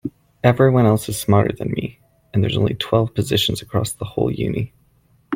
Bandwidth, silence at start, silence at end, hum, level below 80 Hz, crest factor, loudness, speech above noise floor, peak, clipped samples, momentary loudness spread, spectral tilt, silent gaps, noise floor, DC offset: 16.5 kHz; 0.05 s; 0 s; none; -46 dBFS; 18 dB; -19 LUFS; 39 dB; 0 dBFS; under 0.1%; 11 LU; -6 dB/octave; none; -57 dBFS; under 0.1%